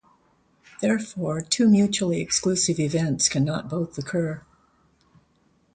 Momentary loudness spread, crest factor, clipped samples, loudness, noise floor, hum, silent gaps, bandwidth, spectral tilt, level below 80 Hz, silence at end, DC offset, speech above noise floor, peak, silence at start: 10 LU; 18 dB; under 0.1%; -23 LUFS; -64 dBFS; none; none; 9.4 kHz; -4.5 dB/octave; -58 dBFS; 1.35 s; under 0.1%; 41 dB; -6 dBFS; 0.8 s